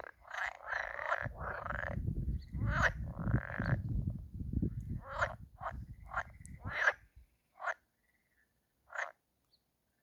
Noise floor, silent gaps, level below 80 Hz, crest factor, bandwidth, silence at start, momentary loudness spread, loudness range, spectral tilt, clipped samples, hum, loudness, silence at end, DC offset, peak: -78 dBFS; none; -48 dBFS; 24 dB; 14 kHz; 0 s; 13 LU; 4 LU; -6.5 dB/octave; under 0.1%; none; -39 LUFS; 0.9 s; under 0.1%; -16 dBFS